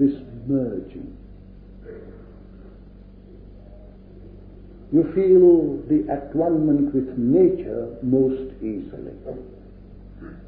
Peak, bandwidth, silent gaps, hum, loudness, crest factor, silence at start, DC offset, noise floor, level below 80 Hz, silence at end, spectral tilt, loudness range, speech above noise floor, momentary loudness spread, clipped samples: -6 dBFS; 3.9 kHz; none; none; -20 LUFS; 16 dB; 0 s; under 0.1%; -44 dBFS; -46 dBFS; 0.05 s; -13.5 dB/octave; 13 LU; 24 dB; 25 LU; under 0.1%